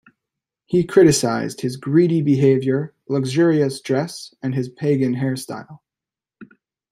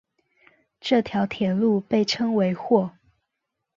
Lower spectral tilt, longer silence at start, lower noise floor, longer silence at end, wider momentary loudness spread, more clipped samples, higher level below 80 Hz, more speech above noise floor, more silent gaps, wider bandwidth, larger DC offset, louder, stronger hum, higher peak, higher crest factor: about the same, -6 dB/octave vs -6 dB/octave; second, 0.7 s vs 0.85 s; first, -89 dBFS vs -81 dBFS; second, 0.45 s vs 0.85 s; first, 12 LU vs 4 LU; neither; about the same, -58 dBFS vs -62 dBFS; first, 71 dB vs 60 dB; neither; first, 15.5 kHz vs 7.4 kHz; neither; first, -19 LUFS vs -23 LUFS; neither; first, -2 dBFS vs -6 dBFS; about the same, 18 dB vs 18 dB